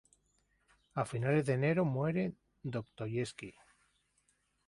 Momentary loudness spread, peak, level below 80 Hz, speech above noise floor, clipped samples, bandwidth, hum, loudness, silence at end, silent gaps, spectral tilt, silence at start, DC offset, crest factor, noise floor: 13 LU; -20 dBFS; -68 dBFS; 42 dB; under 0.1%; 11.5 kHz; 50 Hz at -60 dBFS; -35 LUFS; 1.15 s; none; -7.5 dB/octave; 0.95 s; under 0.1%; 18 dB; -76 dBFS